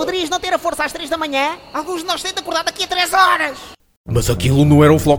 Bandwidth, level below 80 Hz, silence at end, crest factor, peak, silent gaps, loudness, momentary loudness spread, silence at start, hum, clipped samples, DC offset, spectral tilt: over 20 kHz; -36 dBFS; 0 s; 16 dB; 0 dBFS; 3.97-4.04 s; -16 LUFS; 11 LU; 0 s; none; under 0.1%; under 0.1%; -5 dB/octave